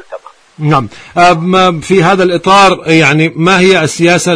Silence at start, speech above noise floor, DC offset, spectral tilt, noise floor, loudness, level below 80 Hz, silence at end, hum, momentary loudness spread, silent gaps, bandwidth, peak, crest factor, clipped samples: 0.1 s; 22 dB; under 0.1%; -5 dB/octave; -30 dBFS; -8 LUFS; -42 dBFS; 0 s; none; 6 LU; none; 11 kHz; 0 dBFS; 8 dB; 1%